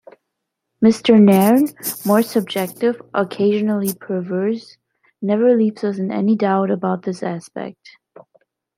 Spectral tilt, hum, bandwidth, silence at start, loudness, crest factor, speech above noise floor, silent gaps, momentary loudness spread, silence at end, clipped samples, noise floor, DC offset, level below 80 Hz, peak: -6.5 dB/octave; none; 16 kHz; 0.8 s; -18 LUFS; 16 dB; 61 dB; none; 14 LU; 1.05 s; under 0.1%; -78 dBFS; under 0.1%; -64 dBFS; -2 dBFS